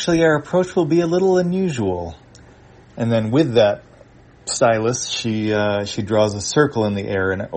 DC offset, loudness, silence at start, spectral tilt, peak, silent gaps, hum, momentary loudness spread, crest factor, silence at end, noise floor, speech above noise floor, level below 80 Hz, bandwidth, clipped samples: under 0.1%; -19 LUFS; 0 s; -5 dB/octave; -2 dBFS; none; none; 7 LU; 18 dB; 0 s; -47 dBFS; 29 dB; -50 dBFS; 8.8 kHz; under 0.1%